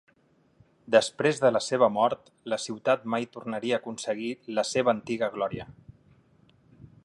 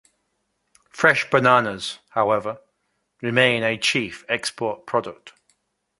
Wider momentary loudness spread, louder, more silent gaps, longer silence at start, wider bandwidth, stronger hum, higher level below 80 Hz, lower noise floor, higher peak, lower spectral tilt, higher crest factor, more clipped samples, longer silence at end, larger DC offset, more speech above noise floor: second, 10 LU vs 14 LU; second, -27 LUFS vs -21 LUFS; neither; about the same, 0.9 s vs 0.95 s; about the same, 11.5 kHz vs 11.5 kHz; neither; about the same, -66 dBFS vs -62 dBFS; second, -65 dBFS vs -73 dBFS; second, -6 dBFS vs 0 dBFS; about the same, -4 dB/octave vs -4 dB/octave; about the same, 22 dB vs 22 dB; neither; second, 0.2 s vs 0.7 s; neither; second, 38 dB vs 52 dB